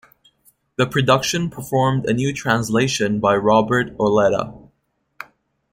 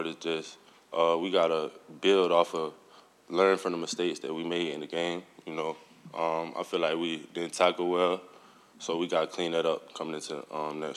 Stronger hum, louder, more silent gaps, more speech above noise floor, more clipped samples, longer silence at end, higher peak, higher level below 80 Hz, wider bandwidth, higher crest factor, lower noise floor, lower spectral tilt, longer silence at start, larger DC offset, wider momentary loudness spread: neither; first, -18 LUFS vs -30 LUFS; neither; first, 51 dB vs 26 dB; neither; first, 0.5 s vs 0 s; first, -2 dBFS vs -10 dBFS; first, -50 dBFS vs -82 dBFS; first, 16.5 kHz vs 13 kHz; about the same, 18 dB vs 20 dB; first, -69 dBFS vs -56 dBFS; about the same, -5 dB/octave vs -4 dB/octave; first, 0.8 s vs 0 s; neither; first, 17 LU vs 12 LU